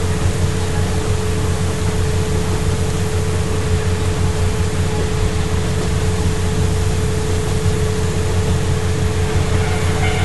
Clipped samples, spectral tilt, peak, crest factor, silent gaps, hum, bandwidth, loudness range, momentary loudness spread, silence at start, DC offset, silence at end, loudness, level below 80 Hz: under 0.1%; -5.5 dB/octave; -4 dBFS; 14 dB; none; none; 12 kHz; 1 LU; 1 LU; 0 s; 6%; 0 s; -19 LUFS; -24 dBFS